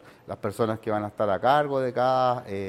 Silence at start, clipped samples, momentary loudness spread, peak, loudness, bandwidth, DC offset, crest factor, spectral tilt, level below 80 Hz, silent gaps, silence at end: 0.05 s; under 0.1%; 10 LU; -8 dBFS; -25 LUFS; 15 kHz; under 0.1%; 18 dB; -6.5 dB/octave; -64 dBFS; none; 0 s